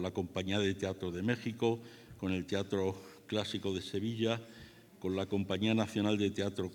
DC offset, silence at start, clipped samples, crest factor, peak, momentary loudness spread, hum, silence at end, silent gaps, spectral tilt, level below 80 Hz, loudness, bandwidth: under 0.1%; 0 s; under 0.1%; 18 dB; -16 dBFS; 9 LU; none; 0 s; none; -6 dB/octave; -72 dBFS; -35 LUFS; 19 kHz